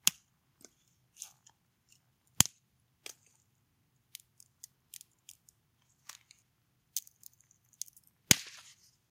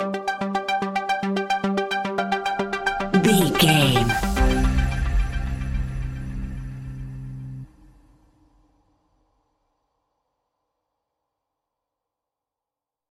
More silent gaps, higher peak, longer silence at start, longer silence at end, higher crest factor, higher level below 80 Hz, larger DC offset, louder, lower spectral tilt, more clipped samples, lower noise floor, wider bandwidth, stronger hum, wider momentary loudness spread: neither; about the same, 0 dBFS vs -2 dBFS; about the same, 0.05 s vs 0 s; second, 0.7 s vs 5.45 s; first, 40 dB vs 22 dB; second, -66 dBFS vs -30 dBFS; neither; second, -31 LUFS vs -22 LUFS; second, -1 dB/octave vs -5 dB/octave; neither; second, -75 dBFS vs -88 dBFS; about the same, 16.5 kHz vs 16 kHz; neither; first, 29 LU vs 18 LU